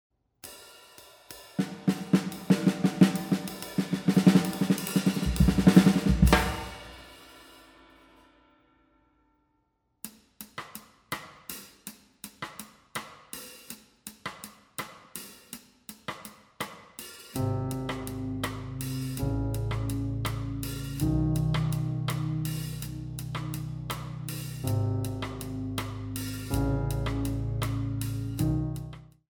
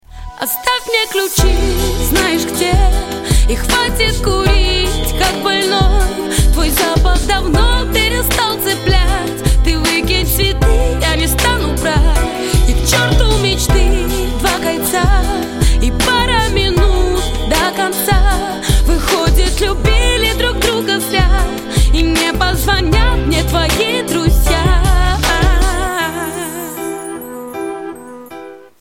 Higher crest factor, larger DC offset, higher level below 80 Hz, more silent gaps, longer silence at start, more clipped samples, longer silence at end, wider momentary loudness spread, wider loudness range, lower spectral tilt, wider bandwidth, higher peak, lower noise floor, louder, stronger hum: first, 26 dB vs 12 dB; neither; second, -40 dBFS vs -16 dBFS; neither; first, 0.45 s vs 0.1 s; neither; about the same, 0.3 s vs 0.2 s; first, 22 LU vs 6 LU; first, 18 LU vs 1 LU; first, -6 dB/octave vs -4 dB/octave; first, over 20 kHz vs 17 kHz; second, -4 dBFS vs 0 dBFS; first, -74 dBFS vs -33 dBFS; second, -29 LUFS vs -14 LUFS; neither